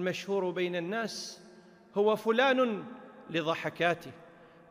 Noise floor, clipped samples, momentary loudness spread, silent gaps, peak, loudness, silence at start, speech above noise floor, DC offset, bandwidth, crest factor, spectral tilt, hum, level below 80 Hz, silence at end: -56 dBFS; under 0.1%; 18 LU; none; -14 dBFS; -31 LUFS; 0 s; 25 dB; under 0.1%; 15.5 kHz; 18 dB; -4.5 dB/octave; none; -78 dBFS; 0.25 s